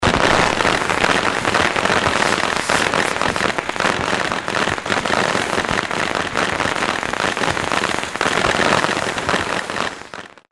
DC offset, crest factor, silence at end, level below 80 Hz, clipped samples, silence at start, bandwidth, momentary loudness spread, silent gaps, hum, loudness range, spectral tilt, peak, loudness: 0.2%; 18 dB; 0.25 s; -42 dBFS; under 0.1%; 0 s; 13.5 kHz; 4 LU; none; none; 2 LU; -3 dB/octave; 0 dBFS; -18 LUFS